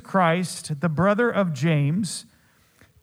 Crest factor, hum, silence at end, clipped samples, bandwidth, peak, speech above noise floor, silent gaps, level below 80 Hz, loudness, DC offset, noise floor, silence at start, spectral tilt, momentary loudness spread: 16 dB; none; 0.8 s; under 0.1%; 14.5 kHz; -8 dBFS; 37 dB; none; -64 dBFS; -23 LUFS; under 0.1%; -59 dBFS; 0.05 s; -6 dB/octave; 9 LU